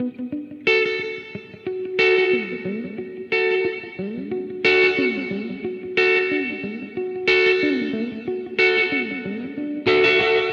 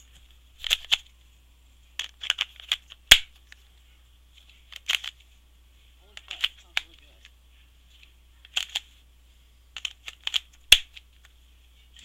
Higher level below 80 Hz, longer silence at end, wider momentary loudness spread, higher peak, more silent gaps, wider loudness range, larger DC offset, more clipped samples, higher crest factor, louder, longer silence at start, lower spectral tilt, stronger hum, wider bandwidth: second, -60 dBFS vs -48 dBFS; second, 0 s vs 1.2 s; second, 14 LU vs 22 LU; second, -6 dBFS vs 0 dBFS; neither; second, 3 LU vs 12 LU; neither; neither; second, 16 dB vs 30 dB; first, -20 LUFS vs -24 LUFS; second, 0 s vs 0.6 s; first, -5.5 dB/octave vs 1.5 dB/octave; neither; second, 7 kHz vs 16.5 kHz